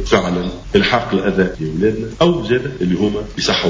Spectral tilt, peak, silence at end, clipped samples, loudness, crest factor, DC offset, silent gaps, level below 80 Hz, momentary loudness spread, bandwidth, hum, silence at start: -5.5 dB/octave; 0 dBFS; 0 s; under 0.1%; -17 LUFS; 16 dB; under 0.1%; none; -34 dBFS; 5 LU; 7.6 kHz; none; 0 s